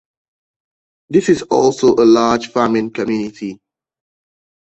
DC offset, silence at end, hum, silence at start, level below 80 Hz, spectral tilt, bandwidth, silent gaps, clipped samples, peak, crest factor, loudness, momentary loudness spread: under 0.1%; 1.15 s; none; 1.1 s; -54 dBFS; -5.5 dB/octave; 8.2 kHz; none; under 0.1%; -2 dBFS; 16 dB; -14 LUFS; 12 LU